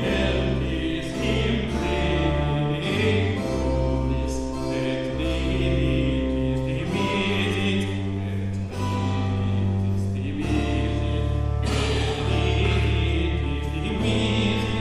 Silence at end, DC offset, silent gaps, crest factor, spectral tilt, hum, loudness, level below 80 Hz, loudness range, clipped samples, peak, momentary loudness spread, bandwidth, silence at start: 0 s; under 0.1%; none; 14 dB; -6.5 dB/octave; none; -24 LUFS; -30 dBFS; 2 LU; under 0.1%; -10 dBFS; 5 LU; 12 kHz; 0 s